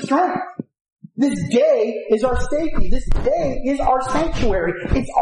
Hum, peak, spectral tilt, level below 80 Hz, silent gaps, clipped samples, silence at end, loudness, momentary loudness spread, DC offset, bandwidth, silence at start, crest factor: none; -4 dBFS; -6.5 dB/octave; -26 dBFS; 0.81-0.85 s, 0.92-0.96 s; under 0.1%; 0 s; -20 LUFS; 9 LU; under 0.1%; 10.5 kHz; 0 s; 14 dB